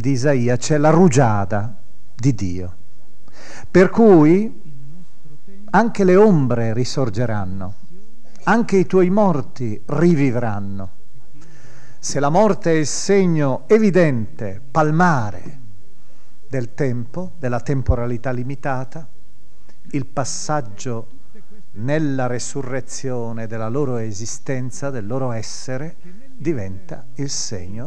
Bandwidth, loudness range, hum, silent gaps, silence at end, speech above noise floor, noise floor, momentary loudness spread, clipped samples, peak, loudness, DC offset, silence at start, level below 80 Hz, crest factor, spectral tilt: 11 kHz; 9 LU; none; none; 0 s; 34 dB; -52 dBFS; 16 LU; under 0.1%; 0 dBFS; -19 LUFS; 9%; 0 s; -42 dBFS; 18 dB; -6.5 dB/octave